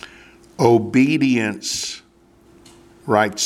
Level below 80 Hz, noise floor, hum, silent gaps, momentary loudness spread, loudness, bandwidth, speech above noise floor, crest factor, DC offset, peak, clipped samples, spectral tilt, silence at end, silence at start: -58 dBFS; -52 dBFS; none; none; 20 LU; -18 LUFS; 15.5 kHz; 36 dB; 20 dB; under 0.1%; 0 dBFS; under 0.1%; -4.5 dB/octave; 0 s; 0.05 s